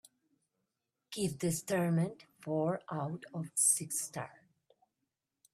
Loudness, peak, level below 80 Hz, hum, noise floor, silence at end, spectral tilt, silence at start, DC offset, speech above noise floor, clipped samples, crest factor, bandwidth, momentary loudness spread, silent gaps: -34 LUFS; -16 dBFS; -76 dBFS; none; -87 dBFS; 1.2 s; -4.5 dB/octave; 1.1 s; under 0.1%; 52 dB; under 0.1%; 20 dB; 15.5 kHz; 16 LU; none